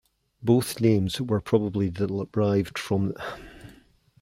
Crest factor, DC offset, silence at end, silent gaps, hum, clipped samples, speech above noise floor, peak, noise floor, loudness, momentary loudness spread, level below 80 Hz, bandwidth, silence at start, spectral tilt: 18 dB; under 0.1%; 0.5 s; none; none; under 0.1%; 32 dB; -8 dBFS; -57 dBFS; -25 LUFS; 12 LU; -56 dBFS; 16.5 kHz; 0.4 s; -6.5 dB/octave